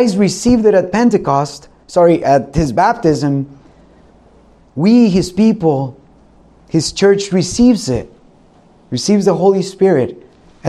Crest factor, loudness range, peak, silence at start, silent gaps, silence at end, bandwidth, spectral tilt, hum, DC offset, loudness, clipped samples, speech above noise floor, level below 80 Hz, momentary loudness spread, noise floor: 14 dB; 3 LU; 0 dBFS; 0 s; none; 0 s; 12 kHz; -6 dB/octave; none; under 0.1%; -13 LUFS; under 0.1%; 34 dB; -38 dBFS; 10 LU; -47 dBFS